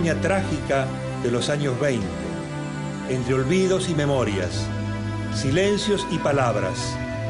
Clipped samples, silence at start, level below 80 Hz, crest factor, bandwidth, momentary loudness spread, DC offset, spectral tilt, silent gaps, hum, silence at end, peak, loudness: under 0.1%; 0 s; -42 dBFS; 14 dB; 11 kHz; 8 LU; under 0.1%; -5.5 dB/octave; none; none; 0 s; -8 dBFS; -24 LUFS